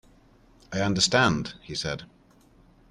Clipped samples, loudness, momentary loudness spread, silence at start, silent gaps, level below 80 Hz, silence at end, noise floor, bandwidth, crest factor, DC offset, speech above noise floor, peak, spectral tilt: under 0.1%; -25 LUFS; 14 LU; 0.7 s; none; -52 dBFS; 0.85 s; -57 dBFS; 12 kHz; 20 dB; under 0.1%; 32 dB; -8 dBFS; -3.5 dB/octave